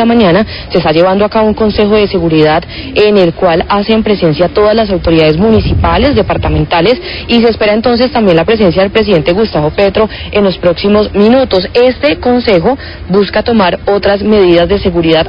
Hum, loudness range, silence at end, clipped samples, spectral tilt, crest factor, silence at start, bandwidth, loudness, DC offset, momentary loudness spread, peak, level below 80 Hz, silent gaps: none; 0 LU; 0 s; 0.4%; -8.5 dB/octave; 8 dB; 0 s; 5.6 kHz; -9 LUFS; 0.1%; 4 LU; 0 dBFS; -24 dBFS; none